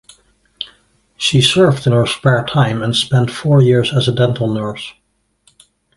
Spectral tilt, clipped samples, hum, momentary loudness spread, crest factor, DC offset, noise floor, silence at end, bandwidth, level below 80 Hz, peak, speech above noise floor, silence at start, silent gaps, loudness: -5.5 dB/octave; under 0.1%; none; 18 LU; 16 dB; under 0.1%; -57 dBFS; 1.05 s; 11.5 kHz; -46 dBFS; 0 dBFS; 44 dB; 0.6 s; none; -14 LUFS